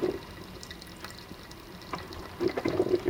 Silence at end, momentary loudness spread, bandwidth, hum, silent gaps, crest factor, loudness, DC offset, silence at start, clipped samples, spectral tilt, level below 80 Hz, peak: 0 s; 15 LU; 18 kHz; none; none; 20 dB; -36 LUFS; under 0.1%; 0 s; under 0.1%; -6 dB/octave; -54 dBFS; -14 dBFS